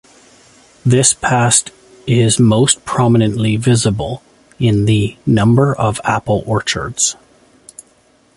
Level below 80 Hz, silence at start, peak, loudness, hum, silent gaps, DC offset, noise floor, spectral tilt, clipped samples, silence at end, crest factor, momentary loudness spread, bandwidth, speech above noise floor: -42 dBFS; 0.85 s; 0 dBFS; -14 LUFS; none; none; under 0.1%; -52 dBFS; -4.5 dB/octave; under 0.1%; 1.25 s; 14 dB; 9 LU; 11.5 kHz; 39 dB